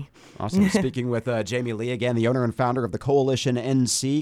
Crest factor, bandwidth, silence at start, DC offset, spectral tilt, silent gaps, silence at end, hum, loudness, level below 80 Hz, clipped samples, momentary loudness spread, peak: 16 dB; 15 kHz; 0 s; under 0.1%; -5.5 dB/octave; none; 0 s; none; -23 LUFS; -54 dBFS; under 0.1%; 6 LU; -8 dBFS